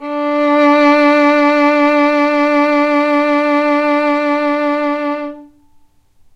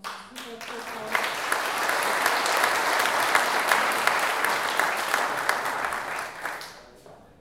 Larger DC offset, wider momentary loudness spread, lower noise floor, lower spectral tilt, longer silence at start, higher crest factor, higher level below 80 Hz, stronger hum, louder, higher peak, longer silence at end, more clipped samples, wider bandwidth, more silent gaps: neither; second, 7 LU vs 14 LU; about the same, -48 dBFS vs -50 dBFS; first, -3.5 dB/octave vs -0.5 dB/octave; about the same, 0 s vs 0.05 s; second, 12 dB vs 24 dB; first, -56 dBFS vs -66 dBFS; neither; first, -12 LUFS vs -24 LUFS; about the same, -2 dBFS vs -4 dBFS; first, 0.9 s vs 0.25 s; neither; second, 7.6 kHz vs 17 kHz; neither